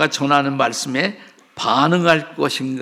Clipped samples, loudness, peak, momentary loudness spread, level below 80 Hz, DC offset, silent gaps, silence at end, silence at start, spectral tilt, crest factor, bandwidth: under 0.1%; -18 LUFS; 0 dBFS; 7 LU; -66 dBFS; under 0.1%; none; 0 s; 0 s; -4.5 dB/octave; 18 dB; 15.5 kHz